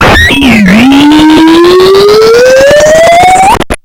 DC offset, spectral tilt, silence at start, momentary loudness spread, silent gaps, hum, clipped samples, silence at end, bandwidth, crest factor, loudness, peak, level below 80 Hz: under 0.1%; -4.5 dB/octave; 0 s; 1 LU; none; none; 30%; 0.05 s; 18 kHz; 2 dB; -2 LUFS; 0 dBFS; -22 dBFS